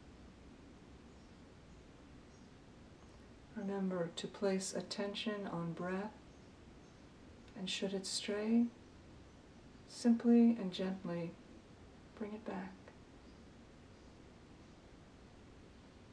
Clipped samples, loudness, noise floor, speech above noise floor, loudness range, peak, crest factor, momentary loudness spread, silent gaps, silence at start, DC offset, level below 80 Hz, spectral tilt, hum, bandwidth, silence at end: under 0.1%; -38 LUFS; -59 dBFS; 22 dB; 19 LU; -20 dBFS; 20 dB; 25 LU; none; 0 s; under 0.1%; -66 dBFS; -5 dB/octave; none; 11 kHz; 0 s